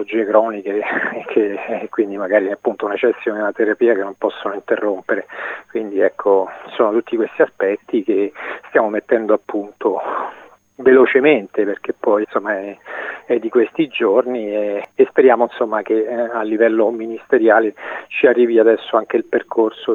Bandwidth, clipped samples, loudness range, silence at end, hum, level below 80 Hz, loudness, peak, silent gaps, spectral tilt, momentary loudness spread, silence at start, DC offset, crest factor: 6.8 kHz; under 0.1%; 4 LU; 0 s; none; -68 dBFS; -17 LUFS; 0 dBFS; none; -7 dB/octave; 11 LU; 0 s; under 0.1%; 16 dB